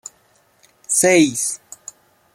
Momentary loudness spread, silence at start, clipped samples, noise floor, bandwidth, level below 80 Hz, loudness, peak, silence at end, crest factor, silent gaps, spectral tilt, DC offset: 25 LU; 0.9 s; under 0.1%; -58 dBFS; 16 kHz; -64 dBFS; -16 LUFS; -2 dBFS; 0.8 s; 20 dB; none; -3 dB/octave; under 0.1%